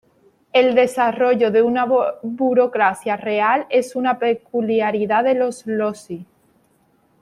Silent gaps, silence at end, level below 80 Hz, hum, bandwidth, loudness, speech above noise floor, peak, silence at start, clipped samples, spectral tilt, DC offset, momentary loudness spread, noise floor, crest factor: none; 0.95 s; -68 dBFS; none; 12 kHz; -18 LUFS; 42 dB; -2 dBFS; 0.55 s; under 0.1%; -5 dB/octave; under 0.1%; 7 LU; -60 dBFS; 16 dB